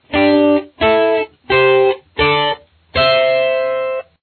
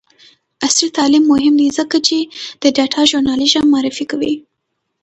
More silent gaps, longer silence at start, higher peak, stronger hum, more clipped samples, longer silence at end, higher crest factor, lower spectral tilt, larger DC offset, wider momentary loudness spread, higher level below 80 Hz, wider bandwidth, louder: neither; second, 0.1 s vs 0.6 s; about the same, -2 dBFS vs 0 dBFS; neither; neither; second, 0.2 s vs 0.65 s; about the same, 12 dB vs 14 dB; first, -8 dB/octave vs -2 dB/octave; neither; about the same, 8 LU vs 8 LU; first, -40 dBFS vs -52 dBFS; second, 4.5 kHz vs 8.8 kHz; about the same, -14 LUFS vs -13 LUFS